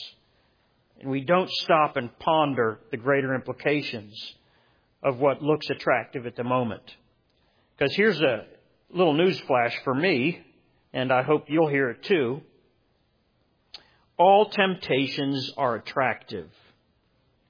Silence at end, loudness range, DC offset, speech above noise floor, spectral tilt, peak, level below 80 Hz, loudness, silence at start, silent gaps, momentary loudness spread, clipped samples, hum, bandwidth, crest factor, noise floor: 1.05 s; 3 LU; under 0.1%; 44 dB; -7 dB/octave; -6 dBFS; -68 dBFS; -24 LUFS; 0 s; none; 14 LU; under 0.1%; none; 5.4 kHz; 20 dB; -68 dBFS